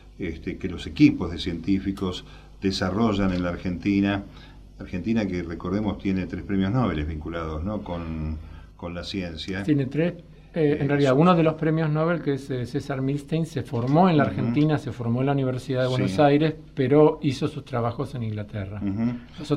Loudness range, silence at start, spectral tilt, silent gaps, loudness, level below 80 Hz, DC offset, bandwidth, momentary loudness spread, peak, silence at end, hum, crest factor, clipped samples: 6 LU; 0.05 s; -7.5 dB/octave; none; -25 LUFS; -44 dBFS; under 0.1%; 11 kHz; 13 LU; -4 dBFS; 0 s; none; 20 dB; under 0.1%